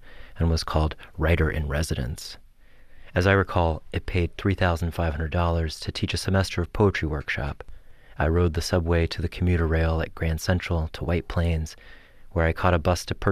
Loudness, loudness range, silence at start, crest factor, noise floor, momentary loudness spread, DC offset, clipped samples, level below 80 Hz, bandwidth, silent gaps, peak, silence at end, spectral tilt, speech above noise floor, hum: -25 LUFS; 1 LU; 0.05 s; 18 dB; -48 dBFS; 7 LU; under 0.1%; under 0.1%; -34 dBFS; 14.5 kHz; none; -6 dBFS; 0 s; -6 dB/octave; 24 dB; none